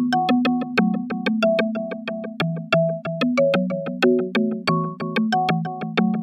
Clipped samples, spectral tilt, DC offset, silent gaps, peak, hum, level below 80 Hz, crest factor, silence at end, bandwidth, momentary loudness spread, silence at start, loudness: under 0.1%; -7 dB/octave; under 0.1%; none; -6 dBFS; none; -70 dBFS; 16 dB; 0 s; 9.8 kHz; 7 LU; 0 s; -22 LUFS